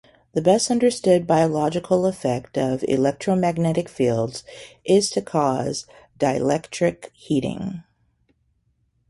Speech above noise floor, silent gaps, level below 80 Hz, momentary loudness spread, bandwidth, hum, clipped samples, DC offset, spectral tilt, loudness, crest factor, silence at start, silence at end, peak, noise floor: 46 dB; none; -56 dBFS; 12 LU; 11.5 kHz; none; under 0.1%; under 0.1%; -5.5 dB/octave; -21 LUFS; 18 dB; 0.35 s; 1.3 s; -4 dBFS; -67 dBFS